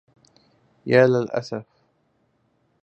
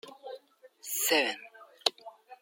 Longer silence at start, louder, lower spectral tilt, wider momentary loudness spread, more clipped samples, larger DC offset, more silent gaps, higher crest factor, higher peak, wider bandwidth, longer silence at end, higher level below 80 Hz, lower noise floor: first, 0.85 s vs 0.05 s; first, -20 LUFS vs -29 LUFS; first, -7 dB/octave vs 0.5 dB/octave; second, 18 LU vs 25 LU; neither; neither; neither; second, 22 dB vs 28 dB; first, -2 dBFS vs -6 dBFS; second, 8 kHz vs 16.5 kHz; first, 1.2 s vs 0.05 s; first, -68 dBFS vs under -90 dBFS; first, -67 dBFS vs -56 dBFS